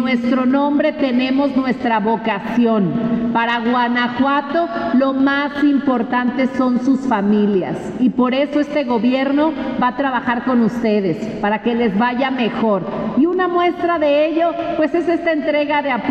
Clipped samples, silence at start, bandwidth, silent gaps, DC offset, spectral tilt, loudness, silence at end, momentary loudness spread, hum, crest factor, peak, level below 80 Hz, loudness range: under 0.1%; 0 s; 8.2 kHz; none; under 0.1%; -7 dB/octave; -17 LUFS; 0 s; 3 LU; none; 12 dB; -6 dBFS; -52 dBFS; 1 LU